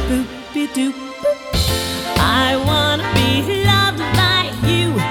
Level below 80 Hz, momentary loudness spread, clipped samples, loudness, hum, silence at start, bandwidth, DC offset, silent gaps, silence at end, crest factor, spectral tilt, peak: -30 dBFS; 8 LU; under 0.1%; -16 LUFS; none; 0 s; 18.5 kHz; under 0.1%; none; 0 s; 16 dB; -4.5 dB/octave; -2 dBFS